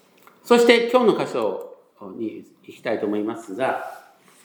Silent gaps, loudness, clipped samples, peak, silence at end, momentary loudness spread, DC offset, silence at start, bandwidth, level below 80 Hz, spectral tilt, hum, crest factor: none; -21 LUFS; under 0.1%; -2 dBFS; 0.45 s; 23 LU; under 0.1%; 0.45 s; 20 kHz; -78 dBFS; -4.5 dB/octave; none; 22 dB